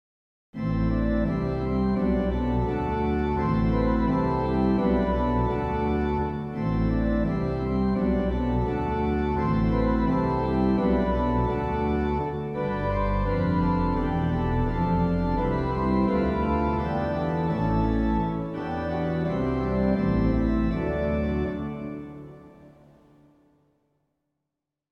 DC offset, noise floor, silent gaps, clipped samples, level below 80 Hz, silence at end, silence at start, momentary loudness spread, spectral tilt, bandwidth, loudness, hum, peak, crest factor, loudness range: under 0.1%; -85 dBFS; none; under 0.1%; -34 dBFS; 2.25 s; 0.55 s; 5 LU; -10 dB/octave; 6.6 kHz; -25 LUFS; none; -10 dBFS; 14 dB; 2 LU